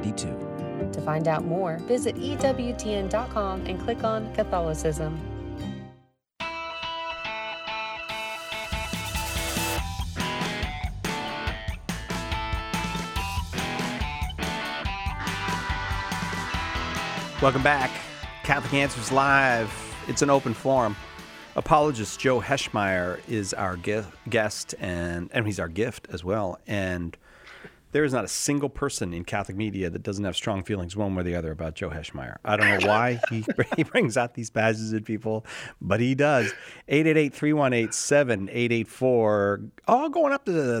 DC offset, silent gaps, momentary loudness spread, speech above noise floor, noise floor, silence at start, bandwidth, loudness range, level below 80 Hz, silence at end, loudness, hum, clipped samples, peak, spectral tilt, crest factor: under 0.1%; none; 11 LU; 32 dB; -57 dBFS; 0 s; 16.5 kHz; 7 LU; -42 dBFS; 0 s; -26 LUFS; none; under 0.1%; -4 dBFS; -4.5 dB/octave; 24 dB